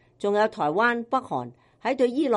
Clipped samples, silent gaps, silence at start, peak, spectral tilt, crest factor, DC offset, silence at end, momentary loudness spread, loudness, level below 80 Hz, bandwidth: under 0.1%; none; 0.2 s; -10 dBFS; -6 dB/octave; 16 dB; under 0.1%; 0 s; 10 LU; -25 LUFS; -70 dBFS; 11 kHz